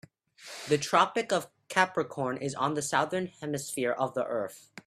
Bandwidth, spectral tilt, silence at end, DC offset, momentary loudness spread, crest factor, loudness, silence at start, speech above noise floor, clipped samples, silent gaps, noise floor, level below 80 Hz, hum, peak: 15.5 kHz; -4 dB/octave; 0.05 s; under 0.1%; 10 LU; 24 dB; -30 LUFS; 0.4 s; 21 dB; under 0.1%; none; -51 dBFS; -72 dBFS; none; -8 dBFS